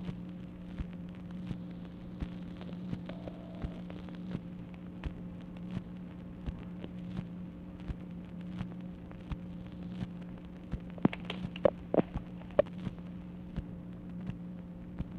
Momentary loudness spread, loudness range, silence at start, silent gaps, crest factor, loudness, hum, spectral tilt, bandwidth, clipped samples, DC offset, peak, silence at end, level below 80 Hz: 13 LU; 8 LU; 0 s; none; 28 dB; -40 LUFS; none; -9 dB/octave; 6.4 kHz; under 0.1%; under 0.1%; -12 dBFS; 0 s; -50 dBFS